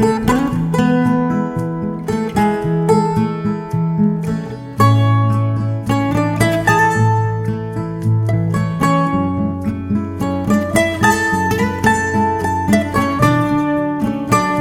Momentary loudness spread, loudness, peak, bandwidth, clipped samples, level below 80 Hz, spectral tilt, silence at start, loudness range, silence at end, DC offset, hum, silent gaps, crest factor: 7 LU; -16 LUFS; 0 dBFS; 16 kHz; under 0.1%; -40 dBFS; -6.5 dB/octave; 0 s; 2 LU; 0 s; under 0.1%; none; none; 16 dB